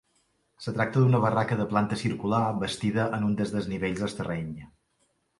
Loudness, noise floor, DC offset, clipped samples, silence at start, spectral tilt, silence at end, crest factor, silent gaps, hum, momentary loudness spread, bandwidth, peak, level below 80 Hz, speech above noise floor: -27 LUFS; -72 dBFS; under 0.1%; under 0.1%; 0.6 s; -7 dB/octave; 0.75 s; 18 dB; none; none; 11 LU; 11.5 kHz; -10 dBFS; -56 dBFS; 45 dB